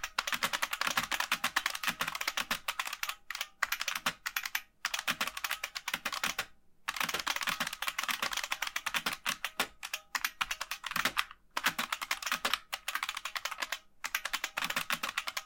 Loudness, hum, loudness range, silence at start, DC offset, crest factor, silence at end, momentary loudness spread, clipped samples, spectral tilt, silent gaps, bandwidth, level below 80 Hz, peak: -34 LUFS; none; 2 LU; 0 s; under 0.1%; 26 dB; 0 s; 5 LU; under 0.1%; 0.5 dB/octave; none; 17 kHz; -64 dBFS; -10 dBFS